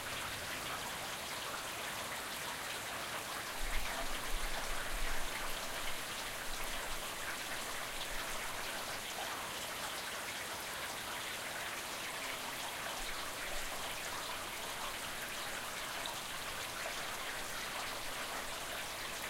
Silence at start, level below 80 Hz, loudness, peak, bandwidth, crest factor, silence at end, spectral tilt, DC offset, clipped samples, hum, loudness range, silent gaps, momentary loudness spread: 0 s; -50 dBFS; -40 LUFS; -22 dBFS; 16 kHz; 18 dB; 0 s; -1 dB/octave; under 0.1%; under 0.1%; none; 1 LU; none; 1 LU